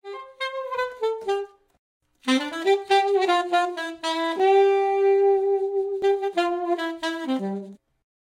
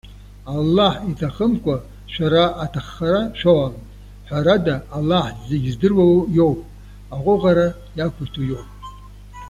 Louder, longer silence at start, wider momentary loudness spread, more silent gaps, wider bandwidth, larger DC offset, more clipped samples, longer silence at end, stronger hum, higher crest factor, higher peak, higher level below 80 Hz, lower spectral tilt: second, -23 LUFS vs -19 LUFS; about the same, 0.05 s vs 0.05 s; second, 12 LU vs 15 LU; first, 1.79-2.00 s vs none; second, 10.5 kHz vs 12 kHz; neither; neither; first, 0.5 s vs 0 s; second, none vs 50 Hz at -35 dBFS; about the same, 16 dB vs 16 dB; second, -8 dBFS vs -2 dBFS; second, -70 dBFS vs -40 dBFS; second, -4 dB/octave vs -7.5 dB/octave